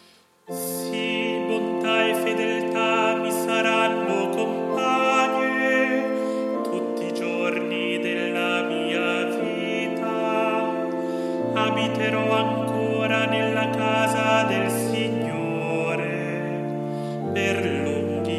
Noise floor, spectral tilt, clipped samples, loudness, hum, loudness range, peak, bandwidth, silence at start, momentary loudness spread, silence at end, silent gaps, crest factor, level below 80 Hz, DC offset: -50 dBFS; -5 dB/octave; under 0.1%; -23 LUFS; none; 3 LU; -8 dBFS; 15.5 kHz; 0.5 s; 7 LU; 0 s; none; 16 dB; -76 dBFS; under 0.1%